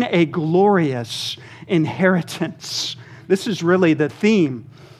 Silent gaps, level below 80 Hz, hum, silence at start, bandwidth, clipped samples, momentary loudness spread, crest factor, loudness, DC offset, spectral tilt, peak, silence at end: none; -66 dBFS; none; 0 s; 14.5 kHz; under 0.1%; 11 LU; 18 dB; -19 LUFS; under 0.1%; -5.5 dB/octave; -2 dBFS; 0.15 s